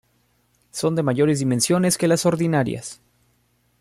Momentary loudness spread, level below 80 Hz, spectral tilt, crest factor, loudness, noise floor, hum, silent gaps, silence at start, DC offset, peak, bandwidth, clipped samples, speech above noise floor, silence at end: 11 LU; -58 dBFS; -5 dB/octave; 16 dB; -20 LUFS; -64 dBFS; 60 Hz at -45 dBFS; none; 0.75 s; under 0.1%; -6 dBFS; 15.5 kHz; under 0.1%; 45 dB; 0.85 s